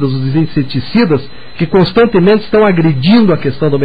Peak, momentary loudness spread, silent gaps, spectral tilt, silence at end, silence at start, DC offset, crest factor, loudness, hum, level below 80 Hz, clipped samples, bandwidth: 0 dBFS; 7 LU; none; -9.5 dB/octave; 0 s; 0 s; 6%; 10 dB; -11 LUFS; none; -36 dBFS; under 0.1%; 5 kHz